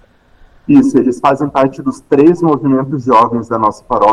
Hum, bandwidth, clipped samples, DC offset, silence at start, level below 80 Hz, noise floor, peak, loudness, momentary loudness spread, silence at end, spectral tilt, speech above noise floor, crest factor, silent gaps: none; 10 kHz; under 0.1%; under 0.1%; 0.7 s; -46 dBFS; -45 dBFS; 0 dBFS; -12 LUFS; 6 LU; 0 s; -8 dB/octave; 34 dB; 12 dB; none